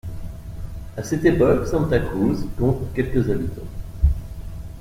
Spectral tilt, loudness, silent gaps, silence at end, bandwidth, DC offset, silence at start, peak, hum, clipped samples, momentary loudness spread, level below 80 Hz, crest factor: -8 dB/octave; -22 LUFS; none; 0 s; 16 kHz; under 0.1%; 0.05 s; -4 dBFS; none; under 0.1%; 18 LU; -30 dBFS; 18 dB